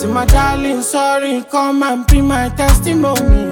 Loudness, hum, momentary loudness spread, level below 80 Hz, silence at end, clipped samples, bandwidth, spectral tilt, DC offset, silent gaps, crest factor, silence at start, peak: -14 LUFS; none; 4 LU; -16 dBFS; 0 s; under 0.1%; 17.5 kHz; -5.5 dB/octave; under 0.1%; none; 12 dB; 0 s; 0 dBFS